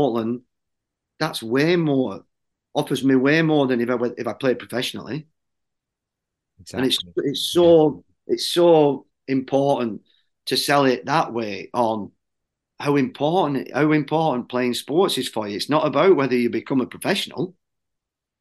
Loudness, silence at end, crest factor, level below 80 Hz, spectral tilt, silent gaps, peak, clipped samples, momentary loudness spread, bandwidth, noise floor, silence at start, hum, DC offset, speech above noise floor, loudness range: -21 LUFS; 0.9 s; 18 dB; -68 dBFS; -5.5 dB/octave; none; -4 dBFS; under 0.1%; 12 LU; 12.5 kHz; -84 dBFS; 0 s; none; under 0.1%; 63 dB; 5 LU